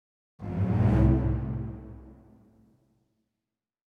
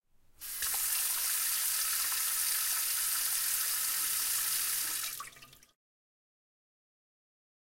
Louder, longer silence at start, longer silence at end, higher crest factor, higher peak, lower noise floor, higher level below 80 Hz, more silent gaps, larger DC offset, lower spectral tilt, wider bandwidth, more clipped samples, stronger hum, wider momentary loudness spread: first, -27 LUFS vs -30 LUFS; about the same, 0.4 s vs 0.4 s; second, 1.85 s vs 2.3 s; about the same, 18 dB vs 18 dB; first, -10 dBFS vs -18 dBFS; first, -89 dBFS vs -55 dBFS; first, -36 dBFS vs -68 dBFS; neither; neither; first, -11 dB/octave vs 3.5 dB/octave; second, 4.7 kHz vs 16.5 kHz; neither; neither; first, 22 LU vs 6 LU